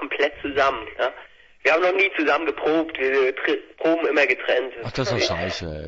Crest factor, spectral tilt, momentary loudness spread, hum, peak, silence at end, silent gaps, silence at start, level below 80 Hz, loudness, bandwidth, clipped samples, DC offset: 16 dB; -4.5 dB/octave; 8 LU; none; -6 dBFS; 0 s; none; 0 s; -50 dBFS; -22 LUFS; 7.8 kHz; under 0.1%; under 0.1%